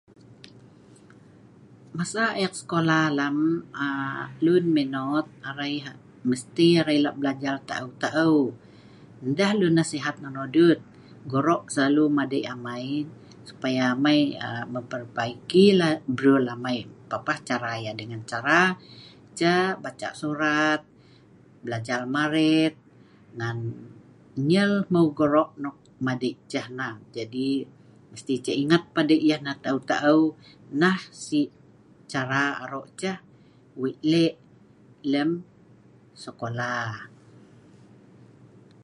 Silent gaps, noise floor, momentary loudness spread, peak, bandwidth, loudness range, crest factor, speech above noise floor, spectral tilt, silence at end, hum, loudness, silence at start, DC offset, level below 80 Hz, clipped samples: none; -54 dBFS; 13 LU; -4 dBFS; 11 kHz; 5 LU; 20 dB; 30 dB; -5.5 dB/octave; 1.75 s; none; -25 LUFS; 0.3 s; under 0.1%; -68 dBFS; under 0.1%